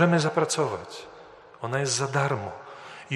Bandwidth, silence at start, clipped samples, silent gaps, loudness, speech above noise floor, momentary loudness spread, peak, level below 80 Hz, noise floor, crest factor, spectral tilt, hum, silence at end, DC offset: 12.5 kHz; 0 s; under 0.1%; none; -26 LUFS; 23 dB; 18 LU; -6 dBFS; -68 dBFS; -48 dBFS; 20 dB; -4.5 dB/octave; none; 0 s; under 0.1%